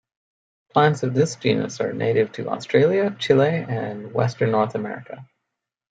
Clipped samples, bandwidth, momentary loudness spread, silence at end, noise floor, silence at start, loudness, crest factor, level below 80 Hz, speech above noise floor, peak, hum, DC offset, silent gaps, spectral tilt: under 0.1%; 9.2 kHz; 11 LU; 0.7 s; -82 dBFS; 0.75 s; -21 LUFS; 20 dB; -64 dBFS; 61 dB; -2 dBFS; none; under 0.1%; none; -6 dB/octave